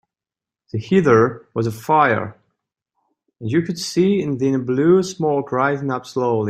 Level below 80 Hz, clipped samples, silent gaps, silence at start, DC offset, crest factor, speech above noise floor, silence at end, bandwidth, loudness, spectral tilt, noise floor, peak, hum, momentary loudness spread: -58 dBFS; under 0.1%; none; 0.75 s; under 0.1%; 18 dB; 71 dB; 0 s; 14.5 kHz; -18 LUFS; -6.5 dB/octave; -89 dBFS; -2 dBFS; none; 9 LU